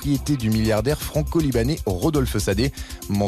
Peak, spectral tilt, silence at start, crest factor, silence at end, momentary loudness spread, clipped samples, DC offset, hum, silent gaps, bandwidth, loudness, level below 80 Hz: -10 dBFS; -6 dB/octave; 0 s; 12 dB; 0 s; 4 LU; under 0.1%; under 0.1%; none; none; 14 kHz; -22 LUFS; -32 dBFS